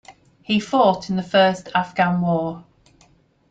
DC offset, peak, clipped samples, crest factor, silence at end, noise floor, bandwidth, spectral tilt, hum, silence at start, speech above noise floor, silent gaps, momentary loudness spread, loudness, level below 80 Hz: under 0.1%; -2 dBFS; under 0.1%; 18 dB; 0.9 s; -57 dBFS; 7.8 kHz; -6 dB/octave; none; 0.1 s; 38 dB; none; 7 LU; -20 LUFS; -58 dBFS